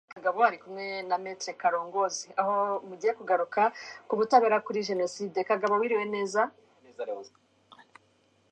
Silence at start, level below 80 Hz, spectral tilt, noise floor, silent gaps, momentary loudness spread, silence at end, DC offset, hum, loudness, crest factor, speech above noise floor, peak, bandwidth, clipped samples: 0.1 s; -84 dBFS; -3.5 dB/octave; -67 dBFS; none; 12 LU; 1.25 s; under 0.1%; none; -28 LUFS; 22 dB; 39 dB; -8 dBFS; 9.6 kHz; under 0.1%